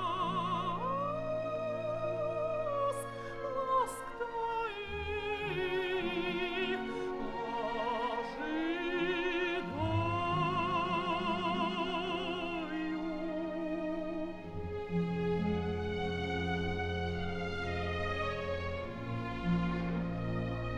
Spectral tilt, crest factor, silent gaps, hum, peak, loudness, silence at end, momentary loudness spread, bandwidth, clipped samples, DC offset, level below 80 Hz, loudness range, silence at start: -6.5 dB/octave; 14 dB; none; none; -20 dBFS; -35 LUFS; 0 s; 5 LU; 12.5 kHz; under 0.1%; under 0.1%; -52 dBFS; 3 LU; 0 s